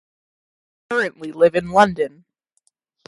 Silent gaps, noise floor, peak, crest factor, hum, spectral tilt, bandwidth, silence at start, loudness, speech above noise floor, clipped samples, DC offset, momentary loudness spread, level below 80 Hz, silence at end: none; -68 dBFS; -2 dBFS; 20 dB; none; -5.5 dB/octave; 11.5 kHz; 0.9 s; -19 LUFS; 50 dB; under 0.1%; under 0.1%; 10 LU; -56 dBFS; 1 s